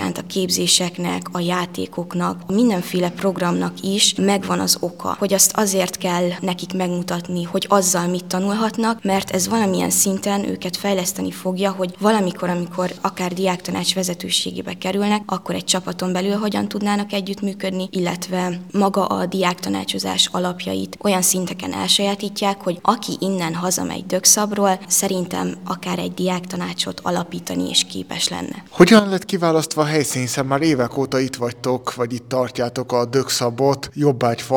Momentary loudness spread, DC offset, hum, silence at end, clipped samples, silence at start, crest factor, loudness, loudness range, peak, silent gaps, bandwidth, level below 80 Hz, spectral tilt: 9 LU; 0.2%; none; 0 s; under 0.1%; 0 s; 20 dB; -19 LUFS; 4 LU; 0 dBFS; none; 19 kHz; -60 dBFS; -3.5 dB/octave